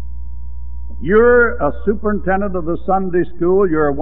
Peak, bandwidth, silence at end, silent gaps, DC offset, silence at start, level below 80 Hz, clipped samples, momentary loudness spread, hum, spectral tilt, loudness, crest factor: 0 dBFS; 3.8 kHz; 0 s; none; 8%; 0 s; -30 dBFS; under 0.1%; 21 LU; 60 Hz at -30 dBFS; -12 dB/octave; -16 LUFS; 14 dB